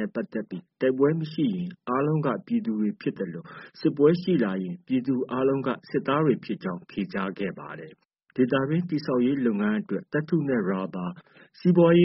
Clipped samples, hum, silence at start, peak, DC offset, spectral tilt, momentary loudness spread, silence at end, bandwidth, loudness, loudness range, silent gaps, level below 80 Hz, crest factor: under 0.1%; none; 0 s; -8 dBFS; under 0.1%; -7 dB/octave; 12 LU; 0 s; 5.8 kHz; -26 LUFS; 3 LU; 8.05-8.09 s; -66 dBFS; 18 dB